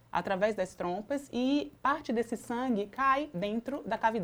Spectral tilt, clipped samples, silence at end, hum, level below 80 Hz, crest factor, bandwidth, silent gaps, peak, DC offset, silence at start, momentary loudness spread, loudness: -5.5 dB/octave; under 0.1%; 0 s; none; -62 dBFS; 18 dB; over 20 kHz; none; -14 dBFS; under 0.1%; 0.15 s; 7 LU; -32 LUFS